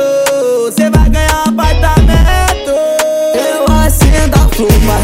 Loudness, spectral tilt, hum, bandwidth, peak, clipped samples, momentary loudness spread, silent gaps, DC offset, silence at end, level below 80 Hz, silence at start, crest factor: -10 LUFS; -5.5 dB/octave; none; 16.5 kHz; 0 dBFS; 0.1%; 3 LU; none; under 0.1%; 0 s; -12 dBFS; 0 s; 8 dB